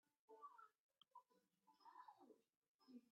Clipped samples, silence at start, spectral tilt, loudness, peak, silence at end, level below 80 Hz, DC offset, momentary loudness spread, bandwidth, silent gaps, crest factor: under 0.1%; 0.1 s; -2 dB/octave; -66 LUFS; -52 dBFS; 0 s; under -90 dBFS; under 0.1%; 4 LU; 5.6 kHz; 0.19-0.28 s, 0.80-0.89 s, 2.57-2.62 s, 2.68-2.79 s; 18 dB